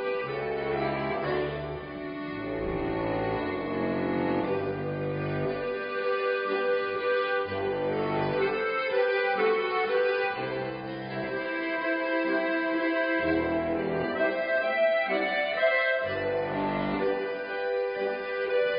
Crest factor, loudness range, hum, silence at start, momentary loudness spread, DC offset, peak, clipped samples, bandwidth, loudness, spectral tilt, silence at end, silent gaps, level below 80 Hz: 16 dB; 4 LU; none; 0 s; 7 LU; under 0.1%; -12 dBFS; under 0.1%; 5.2 kHz; -28 LUFS; -10 dB/octave; 0 s; none; -54 dBFS